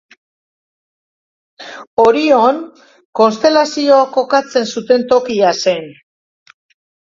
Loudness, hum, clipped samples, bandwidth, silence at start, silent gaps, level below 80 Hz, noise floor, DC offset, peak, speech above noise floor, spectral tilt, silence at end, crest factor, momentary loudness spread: -13 LUFS; none; under 0.1%; 7.6 kHz; 1.6 s; 1.87-1.97 s, 3.05-3.13 s; -58 dBFS; under -90 dBFS; under 0.1%; 0 dBFS; over 78 dB; -4 dB/octave; 1.1 s; 16 dB; 14 LU